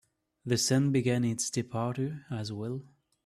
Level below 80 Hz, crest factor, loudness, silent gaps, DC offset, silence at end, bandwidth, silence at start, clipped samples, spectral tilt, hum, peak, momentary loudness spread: -66 dBFS; 16 dB; -30 LUFS; none; under 0.1%; 0.4 s; 14 kHz; 0.45 s; under 0.1%; -5 dB/octave; none; -14 dBFS; 12 LU